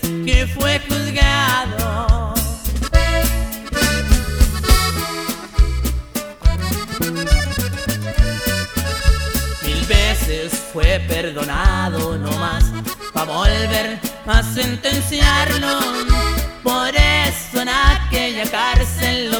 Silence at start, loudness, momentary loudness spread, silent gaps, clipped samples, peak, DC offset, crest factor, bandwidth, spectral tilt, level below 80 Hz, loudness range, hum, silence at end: 0 s; -18 LUFS; 7 LU; none; under 0.1%; 0 dBFS; under 0.1%; 16 dB; over 20 kHz; -4 dB/octave; -20 dBFS; 3 LU; none; 0 s